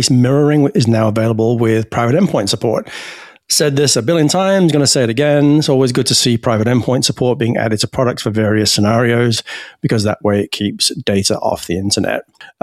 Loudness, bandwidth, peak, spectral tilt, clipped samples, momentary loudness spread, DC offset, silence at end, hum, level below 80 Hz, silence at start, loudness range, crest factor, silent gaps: -14 LUFS; 14.5 kHz; 0 dBFS; -4.5 dB/octave; under 0.1%; 7 LU; under 0.1%; 0.15 s; none; -48 dBFS; 0 s; 3 LU; 14 dB; none